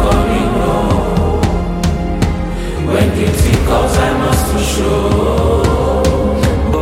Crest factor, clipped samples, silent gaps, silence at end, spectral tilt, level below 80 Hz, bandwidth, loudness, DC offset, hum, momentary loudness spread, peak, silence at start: 12 dB; under 0.1%; none; 0 s; -6 dB/octave; -18 dBFS; 16 kHz; -14 LUFS; under 0.1%; none; 4 LU; 0 dBFS; 0 s